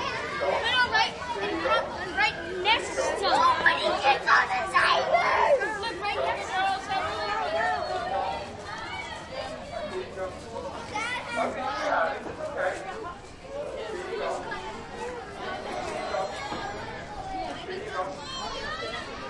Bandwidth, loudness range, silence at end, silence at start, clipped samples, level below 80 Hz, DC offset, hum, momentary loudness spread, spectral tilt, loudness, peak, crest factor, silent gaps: 11.5 kHz; 11 LU; 0 s; 0 s; under 0.1%; -52 dBFS; under 0.1%; none; 14 LU; -3 dB/octave; -28 LUFS; -8 dBFS; 20 dB; none